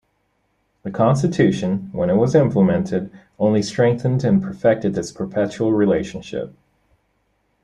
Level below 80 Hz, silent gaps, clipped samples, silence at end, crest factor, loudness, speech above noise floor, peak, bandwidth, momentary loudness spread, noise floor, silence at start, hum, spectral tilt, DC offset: -52 dBFS; none; under 0.1%; 1.15 s; 18 dB; -19 LUFS; 49 dB; -2 dBFS; 10.5 kHz; 13 LU; -67 dBFS; 0.85 s; none; -7.5 dB/octave; under 0.1%